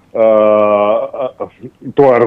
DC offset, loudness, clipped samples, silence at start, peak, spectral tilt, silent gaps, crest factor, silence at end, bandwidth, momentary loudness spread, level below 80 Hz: under 0.1%; -12 LUFS; under 0.1%; 0.15 s; 0 dBFS; -8.5 dB/octave; none; 12 dB; 0 s; 4.4 kHz; 18 LU; -54 dBFS